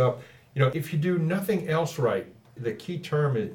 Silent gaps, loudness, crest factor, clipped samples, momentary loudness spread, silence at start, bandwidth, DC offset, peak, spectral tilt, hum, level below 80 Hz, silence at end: none; -27 LUFS; 18 dB; under 0.1%; 10 LU; 0 s; 19.5 kHz; under 0.1%; -8 dBFS; -7 dB/octave; none; -68 dBFS; 0 s